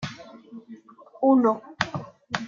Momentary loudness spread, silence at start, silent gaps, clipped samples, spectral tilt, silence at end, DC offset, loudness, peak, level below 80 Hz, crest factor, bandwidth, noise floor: 24 LU; 0 s; none; under 0.1%; -6 dB/octave; 0 s; under 0.1%; -24 LUFS; -4 dBFS; -64 dBFS; 22 dB; 7.4 kHz; -48 dBFS